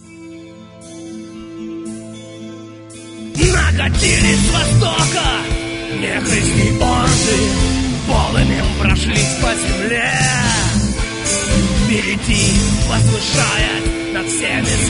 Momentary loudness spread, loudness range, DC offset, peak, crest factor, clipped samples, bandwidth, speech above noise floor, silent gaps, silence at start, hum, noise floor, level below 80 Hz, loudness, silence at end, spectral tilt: 19 LU; 4 LU; under 0.1%; 0 dBFS; 16 dB; under 0.1%; 11 kHz; 21 dB; none; 0.05 s; none; -36 dBFS; -24 dBFS; -15 LUFS; 0 s; -4 dB/octave